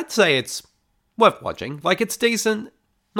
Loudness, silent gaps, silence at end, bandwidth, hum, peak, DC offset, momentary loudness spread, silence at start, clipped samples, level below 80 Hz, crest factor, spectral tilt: -20 LUFS; none; 0 s; 19 kHz; none; -2 dBFS; under 0.1%; 14 LU; 0 s; under 0.1%; -62 dBFS; 20 dB; -3 dB/octave